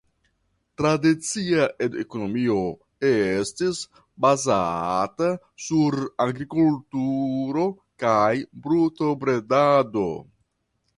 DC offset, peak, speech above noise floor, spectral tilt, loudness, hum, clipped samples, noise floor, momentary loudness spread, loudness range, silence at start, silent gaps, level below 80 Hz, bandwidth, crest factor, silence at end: under 0.1%; -6 dBFS; 51 dB; -5.5 dB/octave; -23 LUFS; none; under 0.1%; -73 dBFS; 8 LU; 2 LU; 0.8 s; none; -58 dBFS; 11.5 kHz; 18 dB; 0.75 s